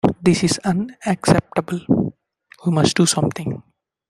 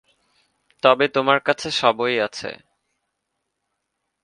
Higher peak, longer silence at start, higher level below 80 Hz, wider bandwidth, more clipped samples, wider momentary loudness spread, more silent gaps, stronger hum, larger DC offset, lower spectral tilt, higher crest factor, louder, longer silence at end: about the same, 0 dBFS vs 0 dBFS; second, 0.05 s vs 0.85 s; first, -48 dBFS vs -66 dBFS; first, 13.5 kHz vs 10.5 kHz; neither; about the same, 11 LU vs 10 LU; neither; neither; neither; first, -5 dB/octave vs -3.5 dB/octave; about the same, 18 dB vs 22 dB; about the same, -19 LUFS vs -19 LUFS; second, 0.5 s vs 1.7 s